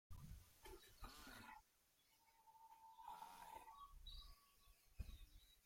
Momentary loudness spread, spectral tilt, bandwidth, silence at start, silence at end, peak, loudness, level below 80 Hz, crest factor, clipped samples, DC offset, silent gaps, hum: 8 LU; -3.5 dB/octave; 16.5 kHz; 0.1 s; 0 s; -38 dBFS; -62 LUFS; -66 dBFS; 22 dB; under 0.1%; under 0.1%; none; none